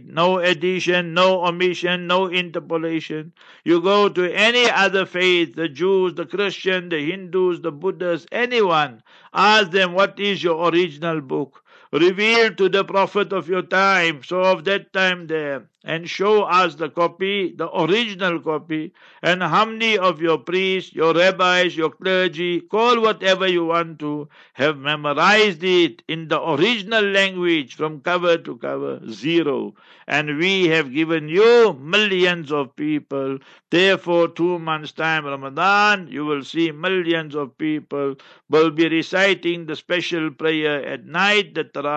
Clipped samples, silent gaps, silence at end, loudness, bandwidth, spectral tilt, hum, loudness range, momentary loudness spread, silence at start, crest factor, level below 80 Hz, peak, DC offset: under 0.1%; none; 0 s; -19 LUFS; 8.4 kHz; -4.5 dB/octave; none; 3 LU; 11 LU; 0.1 s; 16 dB; -72 dBFS; -2 dBFS; under 0.1%